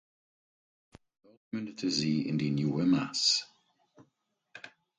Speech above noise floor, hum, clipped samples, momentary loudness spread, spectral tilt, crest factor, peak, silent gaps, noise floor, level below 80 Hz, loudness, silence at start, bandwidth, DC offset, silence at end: 48 dB; none; under 0.1%; 23 LU; -4 dB/octave; 20 dB; -14 dBFS; none; -78 dBFS; -70 dBFS; -30 LUFS; 1.55 s; 9.6 kHz; under 0.1%; 0.3 s